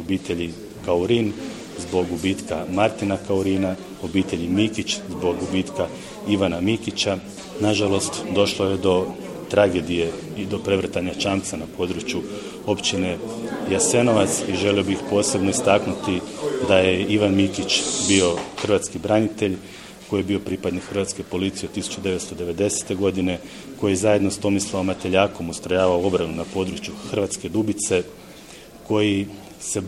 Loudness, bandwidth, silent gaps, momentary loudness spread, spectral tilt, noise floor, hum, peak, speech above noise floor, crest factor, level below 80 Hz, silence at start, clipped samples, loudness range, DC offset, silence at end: -22 LUFS; 15.5 kHz; none; 11 LU; -4.5 dB/octave; -42 dBFS; none; 0 dBFS; 20 dB; 22 dB; -50 dBFS; 0 s; under 0.1%; 5 LU; under 0.1%; 0 s